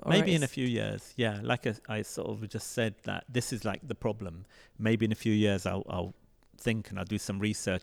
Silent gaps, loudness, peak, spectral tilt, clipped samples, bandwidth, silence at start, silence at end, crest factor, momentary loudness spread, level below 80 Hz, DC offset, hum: none; -32 LUFS; -12 dBFS; -5.5 dB/octave; under 0.1%; 16.5 kHz; 0 s; 0 s; 20 dB; 9 LU; -58 dBFS; under 0.1%; none